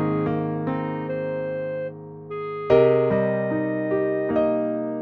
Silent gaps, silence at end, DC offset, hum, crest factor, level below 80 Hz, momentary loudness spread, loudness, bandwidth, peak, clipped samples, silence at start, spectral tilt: none; 0 s; under 0.1%; none; 18 dB; -54 dBFS; 13 LU; -23 LUFS; 5.6 kHz; -4 dBFS; under 0.1%; 0 s; -10 dB/octave